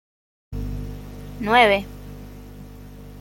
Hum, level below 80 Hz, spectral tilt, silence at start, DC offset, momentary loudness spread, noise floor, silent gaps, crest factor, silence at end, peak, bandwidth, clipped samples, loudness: 50 Hz at -35 dBFS; -38 dBFS; -5 dB/octave; 0.5 s; under 0.1%; 26 LU; -40 dBFS; none; 22 dB; 0 s; -2 dBFS; 16.5 kHz; under 0.1%; -19 LUFS